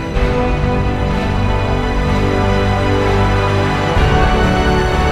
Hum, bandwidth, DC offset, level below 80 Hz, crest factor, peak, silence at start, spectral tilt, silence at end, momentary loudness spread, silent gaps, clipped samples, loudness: none; 12.5 kHz; under 0.1%; -20 dBFS; 12 dB; -2 dBFS; 0 s; -6.5 dB/octave; 0 s; 4 LU; none; under 0.1%; -15 LUFS